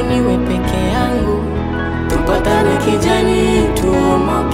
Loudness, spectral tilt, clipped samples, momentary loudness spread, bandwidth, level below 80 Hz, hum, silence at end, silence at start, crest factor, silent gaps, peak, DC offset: -15 LUFS; -6 dB/octave; under 0.1%; 5 LU; 16 kHz; -24 dBFS; none; 0 s; 0 s; 10 dB; none; -4 dBFS; under 0.1%